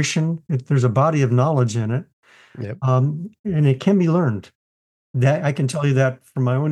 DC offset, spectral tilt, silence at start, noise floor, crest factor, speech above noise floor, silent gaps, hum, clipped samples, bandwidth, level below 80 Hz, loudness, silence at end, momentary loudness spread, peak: under 0.1%; -7 dB/octave; 0 s; under -90 dBFS; 16 dB; over 71 dB; 2.13-2.23 s, 3.39-3.44 s, 4.55-5.14 s; none; under 0.1%; 10 kHz; -62 dBFS; -20 LUFS; 0 s; 9 LU; -4 dBFS